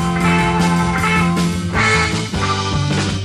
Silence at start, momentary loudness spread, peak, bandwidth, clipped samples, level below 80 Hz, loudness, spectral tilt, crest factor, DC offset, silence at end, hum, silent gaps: 0 s; 4 LU; -4 dBFS; 13.5 kHz; under 0.1%; -32 dBFS; -16 LUFS; -5 dB/octave; 12 dB; under 0.1%; 0 s; none; none